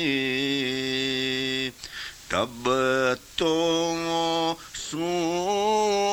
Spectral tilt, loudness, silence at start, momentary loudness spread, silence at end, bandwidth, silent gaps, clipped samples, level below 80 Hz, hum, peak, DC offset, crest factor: -3.5 dB/octave; -25 LUFS; 0 s; 8 LU; 0 s; over 20 kHz; none; under 0.1%; -56 dBFS; none; -8 dBFS; under 0.1%; 16 dB